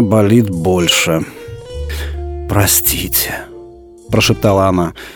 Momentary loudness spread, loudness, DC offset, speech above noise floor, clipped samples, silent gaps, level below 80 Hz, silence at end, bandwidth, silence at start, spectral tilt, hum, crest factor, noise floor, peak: 16 LU; -13 LUFS; under 0.1%; 24 dB; under 0.1%; none; -30 dBFS; 0 s; over 20 kHz; 0 s; -4 dB/octave; none; 14 dB; -36 dBFS; 0 dBFS